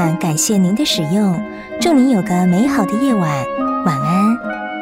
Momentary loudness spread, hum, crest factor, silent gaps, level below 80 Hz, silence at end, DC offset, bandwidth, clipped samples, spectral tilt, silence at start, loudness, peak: 6 LU; none; 12 dB; none; -50 dBFS; 0 s; under 0.1%; 16 kHz; under 0.1%; -5 dB/octave; 0 s; -15 LUFS; -2 dBFS